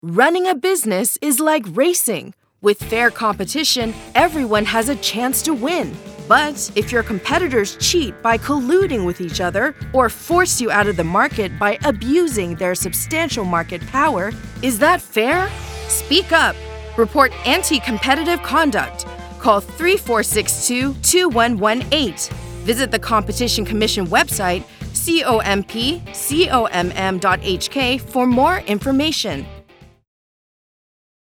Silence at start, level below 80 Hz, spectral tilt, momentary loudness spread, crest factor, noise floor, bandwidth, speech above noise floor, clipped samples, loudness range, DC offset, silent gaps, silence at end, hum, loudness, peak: 0.05 s; -38 dBFS; -3 dB/octave; 7 LU; 18 dB; -44 dBFS; over 20 kHz; 26 dB; under 0.1%; 2 LU; under 0.1%; none; 1.5 s; none; -17 LUFS; 0 dBFS